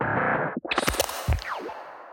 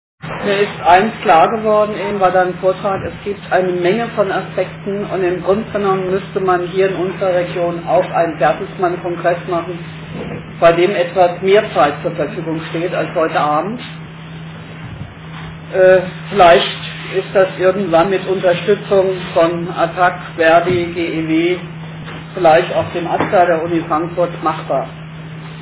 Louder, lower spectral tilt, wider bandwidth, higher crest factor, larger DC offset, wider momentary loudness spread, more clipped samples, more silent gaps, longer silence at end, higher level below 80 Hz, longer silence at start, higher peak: second, -27 LUFS vs -15 LUFS; second, -4 dB/octave vs -10 dB/octave; first, 17 kHz vs 4 kHz; about the same, 20 dB vs 16 dB; neither; second, 11 LU vs 17 LU; neither; neither; about the same, 0 s vs 0 s; first, -38 dBFS vs -46 dBFS; second, 0 s vs 0.25 s; second, -6 dBFS vs 0 dBFS